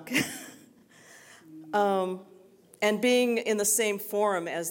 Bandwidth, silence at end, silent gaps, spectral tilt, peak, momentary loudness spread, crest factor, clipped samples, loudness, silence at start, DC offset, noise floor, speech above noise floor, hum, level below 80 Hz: 17 kHz; 0 s; none; -2.5 dB/octave; -10 dBFS; 16 LU; 18 dB; under 0.1%; -27 LUFS; 0 s; under 0.1%; -56 dBFS; 29 dB; none; -74 dBFS